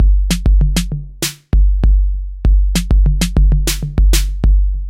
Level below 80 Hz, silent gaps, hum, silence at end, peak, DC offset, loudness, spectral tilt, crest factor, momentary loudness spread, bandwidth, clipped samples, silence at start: -12 dBFS; none; none; 0 s; 0 dBFS; under 0.1%; -16 LUFS; -5 dB/octave; 12 dB; 6 LU; 16 kHz; under 0.1%; 0 s